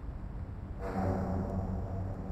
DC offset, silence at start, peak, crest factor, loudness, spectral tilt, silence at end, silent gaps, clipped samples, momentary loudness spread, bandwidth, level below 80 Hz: under 0.1%; 0 s; -20 dBFS; 14 dB; -37 LUFS; -9.5 dB/octave; 0 s; none; under 0.1%; 10 LU; 8.2 kHz; -42 dBFS